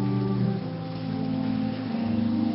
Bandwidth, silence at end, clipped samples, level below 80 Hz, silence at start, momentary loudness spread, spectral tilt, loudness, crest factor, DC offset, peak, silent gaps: 5.8 kHz; 0 s; under 0.1%; -54 dBFS; 0 s; 6 LU; -12 dB/octave; -28 LUFS; 12 dB; under 0.1%; -14 dBFS; none